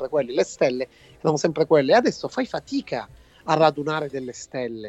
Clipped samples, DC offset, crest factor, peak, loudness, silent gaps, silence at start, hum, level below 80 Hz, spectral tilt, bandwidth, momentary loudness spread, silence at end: under 0.1%; under 0.1%; 20 dB; -4 dBFS; -23 LUFS; none; 0 s; none; -58 dBFS; -5 dB/octave; 8.4 kHz; 13 LU; 0 s